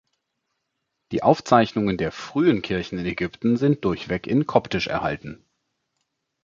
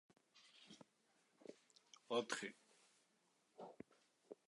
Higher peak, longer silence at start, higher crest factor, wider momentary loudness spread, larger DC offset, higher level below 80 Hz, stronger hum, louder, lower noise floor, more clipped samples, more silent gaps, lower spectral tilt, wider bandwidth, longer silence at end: first, -2 dBFS vs -28 dBFS; first, 1.1 s vs 0.35 s; about the same, 22 dB vs 26 dB; second, 10 LU vs 24 LU; neither; first, -50 dBFS vs under -90 dBFS; neither; first, -22 LUFS vs -48 LUFS; about the same, -78 dBFS vs -81 dBFS; neither; neither; first, -7 dB/octave vs -2.5 dB/octave; second, 7.6 kHz vs 11 kHz; first, 1.1 s vs 0.15 s